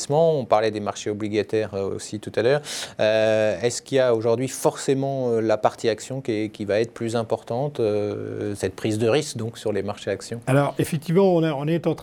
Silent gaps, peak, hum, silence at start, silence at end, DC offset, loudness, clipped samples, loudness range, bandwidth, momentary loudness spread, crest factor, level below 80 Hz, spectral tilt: none; -4 dBFS; none; 0 s; 0 s; under 0.1%; -23 LUFS; under 0.1%; 3 LU; 19.5 kHz; 9 LU; 18 dB; -62 dBFS; -5.5 dB/octave